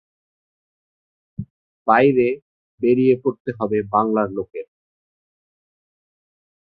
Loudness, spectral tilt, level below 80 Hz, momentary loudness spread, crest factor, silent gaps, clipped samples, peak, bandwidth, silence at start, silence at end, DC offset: -19 LUFS; -11 dB/octave; -58 dBFS; 20 LU; 20 dB; 1.50-1.85 s, 2.42-2.78 s, 3.40-3.45 s; under 0.1%; -2 dBFS; 4.8 kHz; 1.4 s; 2.05 s; under 0.1%